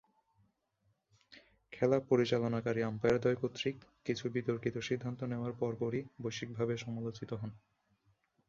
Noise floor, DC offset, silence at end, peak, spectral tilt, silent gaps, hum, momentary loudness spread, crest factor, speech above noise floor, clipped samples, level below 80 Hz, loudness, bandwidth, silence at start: -78 dBFS; under 0.1%; 0.9 s; -16 dBFS; -6.5 dB/octave; none; none; 11 LU; 20 dB; 43 dB; under 0.1%; -68 dBFS; -36 LUFS; 7.6 kHz; 1.3 s